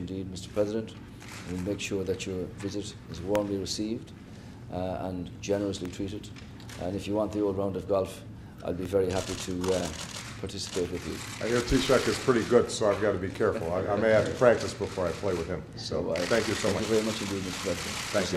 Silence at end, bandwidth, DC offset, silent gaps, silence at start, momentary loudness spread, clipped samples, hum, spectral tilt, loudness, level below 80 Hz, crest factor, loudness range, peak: 0 s; 14.5 kHz; under 0.1%; none; 0 s; 14 LU; under 0.1%; none; -5 dB/octave; -30 LUFS; -50 dBFS; 22 dB; 8 LU; -8 dBFS